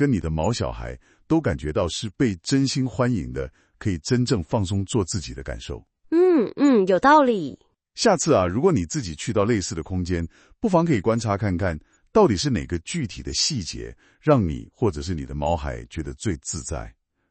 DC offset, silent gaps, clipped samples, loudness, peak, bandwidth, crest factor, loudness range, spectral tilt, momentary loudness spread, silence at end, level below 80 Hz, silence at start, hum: under 0.1%; none; under 0.1%; -23 LUFS; -2 dBFS; 8.8 kHz; 20 dB; 5 LU; -5.5 dB/octave; 15 LU; 0.4 s; -42 dBFS; 0 s; none